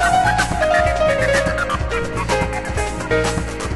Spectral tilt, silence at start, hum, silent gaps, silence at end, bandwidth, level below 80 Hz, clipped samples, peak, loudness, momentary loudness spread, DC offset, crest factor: -4.5 dB/octave; 0 s; none; none; 0 s; 12 kHz; -28 dBFS; under 0.1%; -4 dBFS; -18 LUFS; 7 LU; under 0.1%; 14 dB